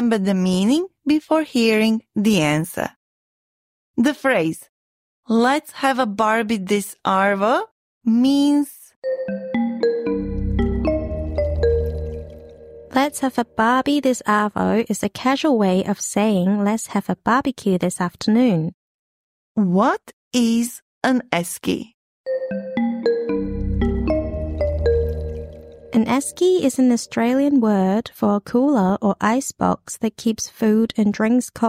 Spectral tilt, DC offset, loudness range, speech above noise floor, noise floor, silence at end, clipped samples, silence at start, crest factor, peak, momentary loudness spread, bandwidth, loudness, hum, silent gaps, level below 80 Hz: -5.5 dB/octave; under 0.1%; 4 LU; 22 dB; -41 dBFS; 0 s; under 0.1%; 0 s; 16 dB; -4 dBFS; 9 LU; 16 kHz; -20 LUFS; none; 2.96-3.94 s, 4.69-5.23 s, 7.71-8.01 s, 8.96-9.02 s, 18.74-19.55 s, 20.13-20.31 s, 20.82-21.01 s, 21.94-22.24 s; -36 dBFS